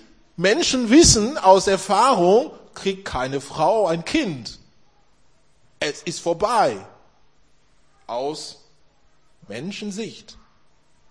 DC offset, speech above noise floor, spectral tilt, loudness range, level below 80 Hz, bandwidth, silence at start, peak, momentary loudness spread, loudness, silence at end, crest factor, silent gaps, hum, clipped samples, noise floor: 0.2%; 42 dB; -3.5 dB/octave; 16 LU; -44 dBFS; 10.5 kHz; 0.4 s; -2 dBFS; 19 LU; -19 LUFS; 0.8 s; 20 dB; none; none; under 0.1%; -61 dBFS